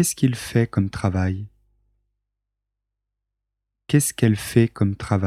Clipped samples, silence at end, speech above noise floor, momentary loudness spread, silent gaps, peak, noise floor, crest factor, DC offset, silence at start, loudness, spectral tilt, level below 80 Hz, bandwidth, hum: under 0.1%; 0 s; 62 dB; 6 LU; none; -4 dBFS; -82 dBFS; 20 dB; under 0.1%; 0 s; -21 LUFS; -6 dB/octave; -50 dBFS; 15.5 kHz; 50 Hz at -50 dBFS